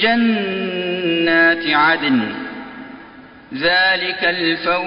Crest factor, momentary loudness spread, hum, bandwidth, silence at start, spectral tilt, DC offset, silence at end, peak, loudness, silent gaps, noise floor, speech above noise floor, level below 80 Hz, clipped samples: 14 dB; 19 LU; none; 5.4 kHz; 0 s; -1.5 dB/octave; under 0.1%; 0 s; -2 dBFS; -16 LUFS; none; -40 dBFS; 24 dB; -56 dBFS; under 0.1%